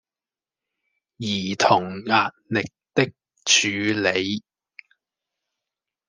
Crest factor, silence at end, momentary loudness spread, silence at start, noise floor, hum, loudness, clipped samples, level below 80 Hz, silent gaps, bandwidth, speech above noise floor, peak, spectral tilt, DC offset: 24 dB; 1.7 s; 10 LU; 1.2 s; under -90 dBFS; none; -22 LUFS; under 0.1%; -70 dBFS; none; 10.5 kHz; over 68 dB; -2 dBFS; -3 dB/octave; under 0.1%